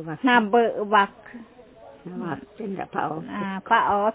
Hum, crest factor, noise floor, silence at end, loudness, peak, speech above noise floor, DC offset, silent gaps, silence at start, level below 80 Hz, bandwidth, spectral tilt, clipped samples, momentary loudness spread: none; 18 dB; -47 dBFS; 0 s; -23 LUFS; -6 dBFS; 24 dB; under 0.1%; none; 0 s; -62 dBFS; 4 kHz; -9 dB/octave; under 0.1%; 22 LU